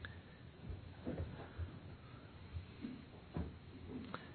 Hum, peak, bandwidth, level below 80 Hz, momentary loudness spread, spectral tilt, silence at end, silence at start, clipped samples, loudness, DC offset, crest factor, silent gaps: none; -28 dBFS; 4.5 kHz; -58 dBFS; 9 LU; -6.5 dB/octave; 0 s; 0 s; under 0.1%; -51 LUFS; under 0.1%; 22 dB; none